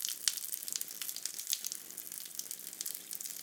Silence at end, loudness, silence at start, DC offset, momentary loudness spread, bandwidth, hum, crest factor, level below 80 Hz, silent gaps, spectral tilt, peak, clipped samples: 0 s; -38 LUFS; 0 s; under 0.1%; 8 LU; 19 kHz; none; 32 dB; under -90 dBFS; none; 2.5 dB/octave; -8 dBFS; under 0.1%